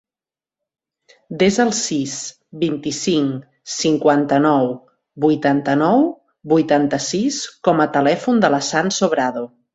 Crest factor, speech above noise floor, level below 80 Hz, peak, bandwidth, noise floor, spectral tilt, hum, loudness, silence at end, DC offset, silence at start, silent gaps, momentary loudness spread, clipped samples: 16 dB; over 73 dB; -58 dBFS; -2 dBFS; 8.2 kHz; under -90 dBFS; -4.5 dB/octave; none; -18 LUFS; 0.3 s; under 0.1%; 1.3 s; none; 10 LU; under 0.1%